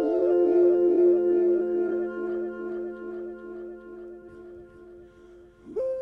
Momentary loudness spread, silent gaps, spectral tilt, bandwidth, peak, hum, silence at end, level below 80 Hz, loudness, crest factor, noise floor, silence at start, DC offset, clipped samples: 23 LU; none; -9 dB/octave; 3 kHz; -12 dBFS; none; 0 s; -62 dBFS; -24 LUFS; 14 dB; -51 dBFS; 0 s; under 0.1%; under 0.1%